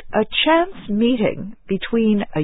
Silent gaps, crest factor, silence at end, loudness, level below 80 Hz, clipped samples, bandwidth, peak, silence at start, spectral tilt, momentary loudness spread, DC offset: none; 14 dB; 0 s; -19 LUFS; -46 dBFS; under 0.1%; 4 kHz; -4 dBFS; 0 s; -11 dB/octave; 10 LU; under 0.1%